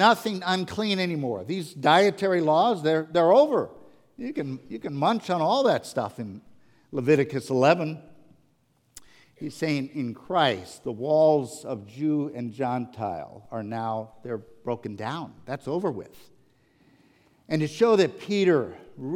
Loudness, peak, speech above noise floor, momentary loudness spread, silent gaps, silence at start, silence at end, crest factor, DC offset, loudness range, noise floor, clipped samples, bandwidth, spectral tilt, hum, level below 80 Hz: -25 LUFS; -4 dBFS; 42 dB; 16 LU; none; 0 s; 0 s; 20 dB; under 0.1%; 10 LU; -67 dBFS; under 0.1%; 16.5 kHz; -6 dB/octave; none; -68 dBFS